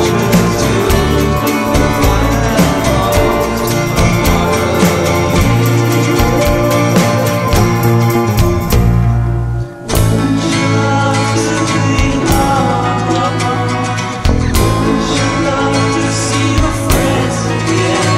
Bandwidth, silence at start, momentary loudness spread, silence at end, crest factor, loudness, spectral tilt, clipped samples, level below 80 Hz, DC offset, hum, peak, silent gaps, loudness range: 16.5 kHz; 0 s; 3 LU; 0 s; 12 dB; -12 LUFS; -5.5 dB/octave; under 0.1%; -22 dBFS; 0.1%; none; 0 dBFS; none; 2 LU